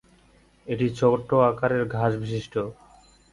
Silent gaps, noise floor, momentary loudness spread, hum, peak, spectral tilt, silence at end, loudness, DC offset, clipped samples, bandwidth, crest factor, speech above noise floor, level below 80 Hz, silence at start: none; -58 dBFS; 12 LU; none; -6 dBFS; -7.5 dB/octave; 0.6 s; -24 LUFS; under 0.1%; under 0.1%; 11.5 kHz; 20 dB; 34 dB; -54 dBFS; 0.65 s